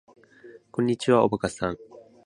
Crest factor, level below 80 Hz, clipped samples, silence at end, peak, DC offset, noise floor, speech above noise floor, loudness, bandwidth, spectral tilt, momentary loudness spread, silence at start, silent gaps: 22 dB; -56 dBFS; under 0.1%; 0.25 s; -6 dBFS; under 0.1%; -50 dBFS; 26 dB; -25 LUFS; 11 kHz; -6 dB/octave; 13 LU; 0.45 s; none